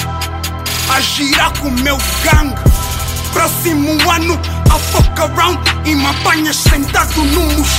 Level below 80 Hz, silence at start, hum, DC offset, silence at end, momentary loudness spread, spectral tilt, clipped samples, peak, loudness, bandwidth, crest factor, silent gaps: -18 dBFS; 0 s; none; under 0.1%; 0 s; 5 LU; -4 dB/octave; under 0.1%; 0 dBFS; -12 LUFS; 16.5 kHz; 12 dB; none